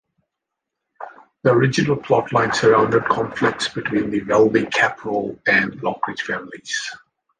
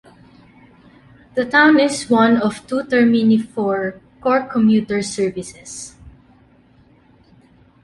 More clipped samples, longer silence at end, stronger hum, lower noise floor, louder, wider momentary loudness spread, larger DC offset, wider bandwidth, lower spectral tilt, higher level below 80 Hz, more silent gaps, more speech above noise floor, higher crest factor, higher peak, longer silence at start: neither; second, 0.45 s vs 1.75 s; neither; first, -82 dBFS vs -51 dBFS; about the same, -19 LUFS vs -17 LUFS; second, 11 LU vs 18 LU; neither; second, 9.8 kHz vs 11.5 kHz; about the same, -5 dB/octave vs -5 dB/octave; about the same, -54 dBFS vs -54 dBFS; neither; first, 63 dB vs 35 dB; about the same, 18 dB vs 16 dB; about the same, -2 dBFS vs -2 dBFS; second, 1 s vs 1.35 s